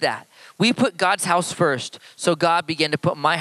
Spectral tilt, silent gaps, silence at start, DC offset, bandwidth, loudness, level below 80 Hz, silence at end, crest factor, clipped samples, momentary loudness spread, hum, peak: -4 dB/octave; none; 0 s; under 0.1%; 13.5 kHz; -21 LUFS; -66 dBFS; 0 s; 18 dB; under 0.1%; 7 LU; none; -4 dBFS